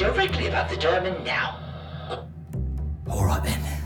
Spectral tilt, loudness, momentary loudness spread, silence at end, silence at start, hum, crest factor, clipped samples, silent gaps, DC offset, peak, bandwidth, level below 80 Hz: -5 dB/octave; -26 LUFS; 12 LU; 0 s; 0 s; none; 16 dB; under 0.1%; none; under 0.1%; -10 dBFS; 19.5 kHz; -34 dBFS